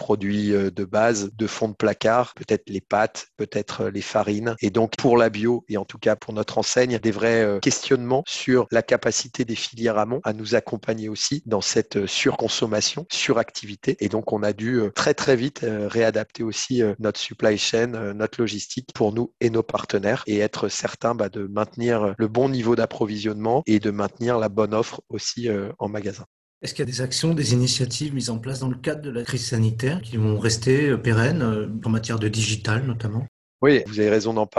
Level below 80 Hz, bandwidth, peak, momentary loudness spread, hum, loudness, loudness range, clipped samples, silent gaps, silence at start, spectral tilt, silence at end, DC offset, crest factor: -54 dBFS; 12 kHz; -4 dBFS; 8 LU; none; -23 LUFS; 3 LU; under 0.1%; 26.26-26.61 s, 33.28-33.59 s; 0 s; -5 dB/octave; 0 s; under 0.1%; 18 dB